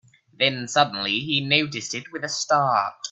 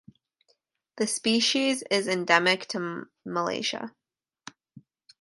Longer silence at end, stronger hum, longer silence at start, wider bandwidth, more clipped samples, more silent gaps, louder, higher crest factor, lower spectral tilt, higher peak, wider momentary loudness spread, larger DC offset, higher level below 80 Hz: second, 0 s vs 0.4 s; neither; second, 0.4 s vs 0.95 s; second, 8.4 kHz vs 12 kHz; neither; neither; first, -22 LUFS vs -26 LUFS; about the same, 22 dB vs 26 dB; about the same, -3 dB/octave vs -2.5 dB/octave; about the same, -2 dBFS vs -4 dBFS; second, 9 LU vs 15 LU; neither; first, -66 dBFS vs -76 dBFS